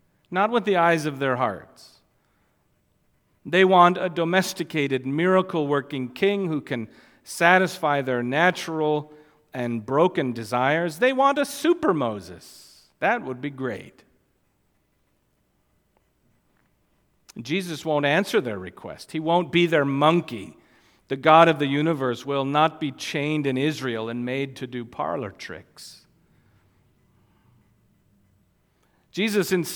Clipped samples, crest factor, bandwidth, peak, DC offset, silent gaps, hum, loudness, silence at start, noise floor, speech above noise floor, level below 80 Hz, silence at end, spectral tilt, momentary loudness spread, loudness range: under 0.1%; 24 dB; 18.5 kHz; -2 dBFS; under 0.1%; none; none; -23 LUFS; 0.3 s; -68 dBFS; 45 dB; -68 dBFS; 0 s; -5.5 dB/octave; 18 LU; 12 LU